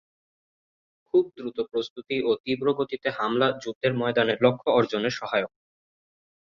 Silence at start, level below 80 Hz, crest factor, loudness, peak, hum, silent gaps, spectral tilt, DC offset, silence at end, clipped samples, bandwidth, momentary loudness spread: 1.15 s; -66 dBFS; 20 dB; -25 LUFS; -6 dBFS; none; 1.90-1.96 s, 2.40-2.44 s, 3.75-3.81 s; -6 dB/octave; under 0.1%; 1 s; under 0.1%; 7.4 kHz; 8 LU